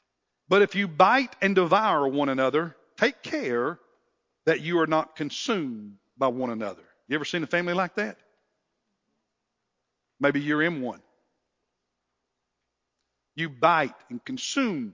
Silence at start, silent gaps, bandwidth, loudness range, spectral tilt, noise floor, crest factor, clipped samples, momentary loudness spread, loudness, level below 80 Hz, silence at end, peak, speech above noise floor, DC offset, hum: 0.5 s; none; 7.6 kHz; 8 LU; -5 dB/octave; -82 dBFS; 22 dB; under 0.1%; 13 LU; -25 LUFS; -76 dBFS; 0 s; -4 dBFS; 57 dB; under 0.1%; none